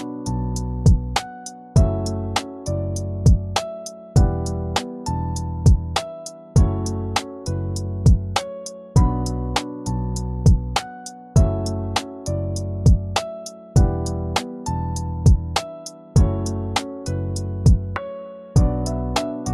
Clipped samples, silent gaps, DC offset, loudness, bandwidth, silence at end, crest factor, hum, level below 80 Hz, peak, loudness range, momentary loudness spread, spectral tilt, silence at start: under 0.1%; none; under 0.1%; -22 LUFS; 13 kHz; 0 s; 16 dB; none; -26 dBFS; -4 dBFS; 1 LU; 10 LU; -6 dB/octave; 0 s